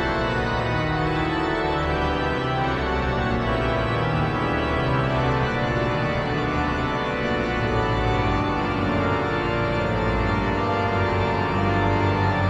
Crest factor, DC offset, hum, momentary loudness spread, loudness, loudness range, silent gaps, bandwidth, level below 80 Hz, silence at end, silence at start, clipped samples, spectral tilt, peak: 12 dB; under 0.1%; none; 2 LU; -23 LUFS; 1 LU; none; 9.2 kHz; -34 dBFS; 0 s; 0 s; under 0.1%; -7 dB/octave; -10 dBFS